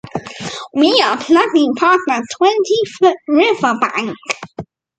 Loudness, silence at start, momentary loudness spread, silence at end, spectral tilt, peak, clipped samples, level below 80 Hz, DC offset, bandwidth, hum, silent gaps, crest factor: -14 LUFS; 0.05 s; 14 LU; 0.35 s; -4 dB/octave; 0 dBFS; under 0.1%; -58 dBFS; under 0.1%; 9.2 kHz; none; none; 16 dB